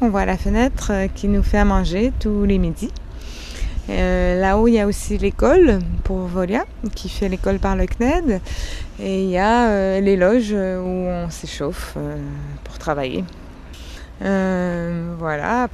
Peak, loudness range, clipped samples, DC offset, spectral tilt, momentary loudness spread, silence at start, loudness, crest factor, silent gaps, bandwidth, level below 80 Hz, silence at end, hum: -2 dBFS; 7 LU; under 0.1%; under 0.1%; -6.5 dB/octave; 14 LU; 0 s; -20 LUFS; 16 dB; none; 13.5 kHz; -26 dBFS; 0 s; none